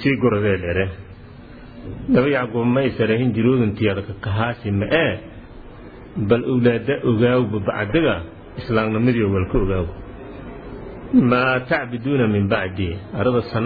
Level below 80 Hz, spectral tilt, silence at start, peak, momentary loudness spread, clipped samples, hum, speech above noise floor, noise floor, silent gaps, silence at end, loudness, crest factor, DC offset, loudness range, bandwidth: -38 dBFS; -10.5 dB/octave; 0 s; -4 dBFS; 18 LU; under 0.1%; none; 21 dB; -40 dBFS; none; 0 s; -20 LUFS; 16 dB; under 0.1%; 2 LU; 4.9 kHz